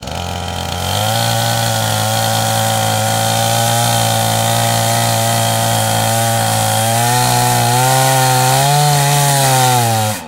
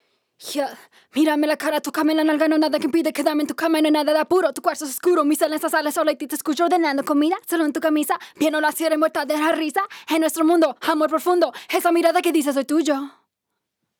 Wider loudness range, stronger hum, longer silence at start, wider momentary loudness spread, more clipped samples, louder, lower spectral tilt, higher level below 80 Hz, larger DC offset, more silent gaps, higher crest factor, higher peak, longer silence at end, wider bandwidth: about the same, 3 LU vs 1 LU; neither; second, 0 s vs 0.4 s; second, 4 LU vs 7 LU; neither; first, -13 LUFS vs -20 LUFS; about the same, -3.5 dB/octave vs -2.5 dB/octave; first, -42 dBFS vs -78 dBFS; neither; neither; about the same, 14 dB vs 16 dB; first, 0 dBFS vs -4 dBFS; second, 0 s vs 0.9 s; second, 16.5 kHz vs 19 kHz